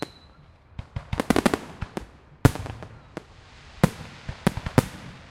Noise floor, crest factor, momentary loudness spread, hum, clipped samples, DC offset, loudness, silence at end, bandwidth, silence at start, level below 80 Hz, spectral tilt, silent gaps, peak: -52 dBFS; 28 dB; 20 LU; none; under 0.1%; under 0.1%; -26 LUFS; 0.1 s; 16.5 kHz; 0 s; -42 dBFS; -6 dB/octave; none; 0 dBFS